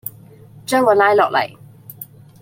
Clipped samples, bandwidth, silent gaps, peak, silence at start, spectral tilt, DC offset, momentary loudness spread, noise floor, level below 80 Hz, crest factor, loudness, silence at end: under 0.1%; 16.5 kHz; none; -2 dBFS; 0.05 s; -4 dB/octave; under 0.1%; 22 LU; -42 dBFS; -64 dBFS; 18 dB; -15 LUFS; 0.4 s